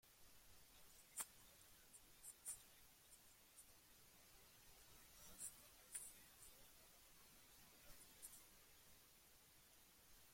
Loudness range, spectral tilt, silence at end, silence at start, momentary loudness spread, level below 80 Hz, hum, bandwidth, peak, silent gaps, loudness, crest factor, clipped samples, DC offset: 6 LU; -0.5 dB/octave; 0 s; 0.05 s; 13 LU; -80 dBFS; none; 16.5 kHz; -36 dBFS; none; -61 LUFS; 28 dB; under 0.1%; under 0.1%